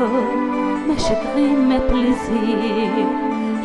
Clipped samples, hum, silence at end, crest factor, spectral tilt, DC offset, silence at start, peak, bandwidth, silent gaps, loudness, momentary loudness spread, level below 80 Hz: under 0.1%; none; 0 s; 12 dB; -6 dB/octave; under 0.1%; 0 s; -6 dBFS; 11 kHz; none; -19 LUFS; 4 LU; -32 dBFS